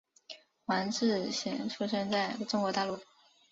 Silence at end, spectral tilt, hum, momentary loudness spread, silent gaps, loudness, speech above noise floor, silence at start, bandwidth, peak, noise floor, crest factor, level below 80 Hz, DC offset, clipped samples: 0.5 s; -3 dB/octave; none; 14 LU; none; -33 LUFS; 21 dB; 0.3 s; 7.8 kHz; -16 dBFS; -53 dBFS; 18 dB; -74 dBFS; under 0.1%; under 0.1%